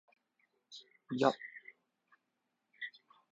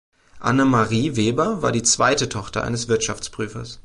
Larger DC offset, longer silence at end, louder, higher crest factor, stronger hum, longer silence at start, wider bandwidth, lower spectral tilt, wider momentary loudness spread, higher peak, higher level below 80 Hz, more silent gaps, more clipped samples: neither; first, 0.45 s vs 0.05 s; second, -37 LUFS vs -20 LUFS; first, 30 dB vs 16 dB; neither; first, 0.7 s vs 0.35 s; second, 7.6 kHz vs 11.5 kHz; about the same, -3.5 dB/octave vs -4 dB/octave; first, 22 LU vs 11 LU; second, -12 dBFS vs -4 dBFS; second, -82 dBFS vs -46 dBFS; neither; neither